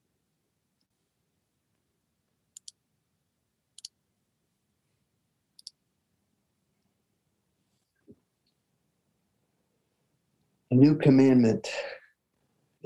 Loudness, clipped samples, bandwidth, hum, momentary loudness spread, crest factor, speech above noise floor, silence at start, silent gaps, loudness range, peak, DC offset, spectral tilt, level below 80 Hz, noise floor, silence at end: -22 LUFS; under 0.1%; 11 kHz; none; 16 LU; 24 dB; 58 dB; 10.7 s; none; 5 LU; -8 dBFS; under 0.1%; -7.5 dB/octave; -74 dBFS; -79 dBFS; 0.9 s